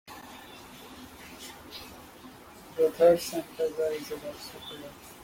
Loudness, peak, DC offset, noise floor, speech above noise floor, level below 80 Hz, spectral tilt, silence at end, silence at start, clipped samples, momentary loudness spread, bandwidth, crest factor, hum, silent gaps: -28 LUFS; -10 dBFS; under 0.1%; -49 dBFS; 21 dB; -62 dBFS; -4 dB/octave; 0 s; 0.1 s; under 0.1%; 24 LU; 16.5 kHz; 22 dB; none; none